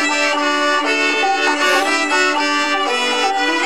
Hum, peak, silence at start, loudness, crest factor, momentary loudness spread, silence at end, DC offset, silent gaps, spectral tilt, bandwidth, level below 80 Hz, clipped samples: none; -2 dBFS; 0 s; -15 LUFS; 14 dB; 2 LU; 0 s; 1%; none; 0 dB/octave; 16.5 kHz; -66 dBFS; under 0.1%